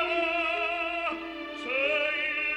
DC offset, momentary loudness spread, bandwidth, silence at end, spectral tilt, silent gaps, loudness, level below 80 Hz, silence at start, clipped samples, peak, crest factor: under 0.1%; 10 LU; 9.8 kHz; 0 s; -3 dB/octave; none; -28 LUFS; -60 dBFS; 0 s; under 0.1%; -14 dBFS; 14 dB